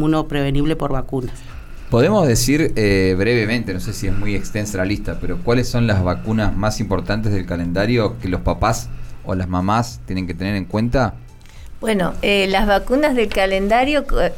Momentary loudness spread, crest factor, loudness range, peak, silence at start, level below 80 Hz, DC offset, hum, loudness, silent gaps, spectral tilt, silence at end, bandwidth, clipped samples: 10 LU; 14 dB; 3 LU; -4 dBFS; 0 s; -28 dBFS; under 0.1%; none; -19 LUFS; none; -5.5 dB/octave; 0 s; 17 kHz; under 0.1%